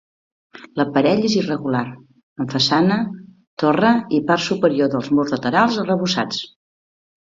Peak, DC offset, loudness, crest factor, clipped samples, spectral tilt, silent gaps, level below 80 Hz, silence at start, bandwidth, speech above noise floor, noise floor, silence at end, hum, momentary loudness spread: -2 dBFS; under 0.1%; -19 LUFS; 16 dB; under 0.1%; -5.5 dB/octave; 2.23-2.36 s, 3.47-3.57 s; -60 dBFS; 0.55 s; 7.8 kHz; over 72 dB; under -90 dBFS; 0.85 s; none; 12 LU